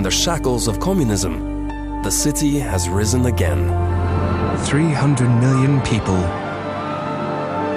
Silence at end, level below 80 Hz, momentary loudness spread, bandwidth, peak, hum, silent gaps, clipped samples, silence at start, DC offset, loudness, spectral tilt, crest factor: 0 s; -30 dBFS; 9 LU; 15.5 kHz; -4 dBFS; none; none; under 0.1%; 0 s; under 0.1%; -19 LUFS; -5 dB/octave; 14 dB